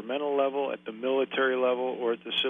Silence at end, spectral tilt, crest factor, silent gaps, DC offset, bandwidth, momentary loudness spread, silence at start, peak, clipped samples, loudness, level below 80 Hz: 0 s; -5.5 dB/octave; 14 dB; none; under 0.1%; 4.2 kHz; 6 LU; 0 s; -14 dBFS; under 0.1%; -28 LUFS; -76 dBFS